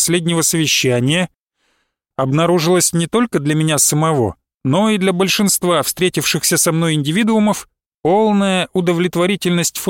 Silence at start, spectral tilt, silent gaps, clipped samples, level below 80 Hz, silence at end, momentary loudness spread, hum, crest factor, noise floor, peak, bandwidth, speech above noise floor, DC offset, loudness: 0 s; -4 dB/octave; 1.38-1.44 s, 4.54-4.60 s, 7.86-7.98 s; under 0.1%; -52 dBFS; 0 s; 6 LU; none; 14 dB; -66 dBFS; -2 dBFS; 17 kHz; 51 dB; under 0.1%; -15 LUFS